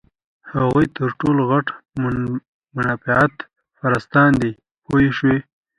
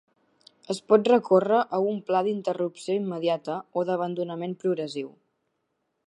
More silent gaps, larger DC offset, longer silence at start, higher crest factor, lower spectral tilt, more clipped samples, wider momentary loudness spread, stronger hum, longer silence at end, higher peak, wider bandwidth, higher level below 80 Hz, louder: first, 2.48-2.60 s, 4.71-4.75 s vs none; neither; second, 0.45 s vs 0.7 s; about the same, 18 dB vs 20 dB; first, -8 dB/octave vs -6.5 dB/octave; neither; about the same, 12 LU vs 12 LU; neither; second, 0.35 s vs 0.95 s; first, 0 dBFS vs -6 dBFS; about the same, 10.5 kHz vs 11.5 kHz; first, -46 dBFS vs -82 dBFS; first, -19 LUFS vs -26 LUFS